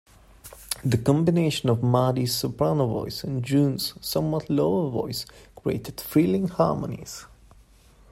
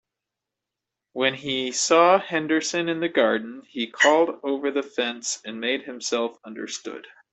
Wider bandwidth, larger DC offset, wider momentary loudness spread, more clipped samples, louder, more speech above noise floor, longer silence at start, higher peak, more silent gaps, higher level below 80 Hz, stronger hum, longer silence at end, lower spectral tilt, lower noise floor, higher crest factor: first, 16 kHz vs 8.4 kHz; neither; second, 12 LU vs 15 LU; neither; about the same, -25 LUFS vs -23 LUFS; second, 30 dB vs 62 dB; second, 0.45 s vs 1.15 s; about the same, -6 dBFS vs -4 dBFS; neither; first, -52 dBFS vs -72 dBFS; neither; first, 0.85 s vs 0.25 s; first, -6 dB/octave vs -2.5 dB/octave; second, -54 dBFS vs -86 dBFS; about the same, 20 dB vs 20 dB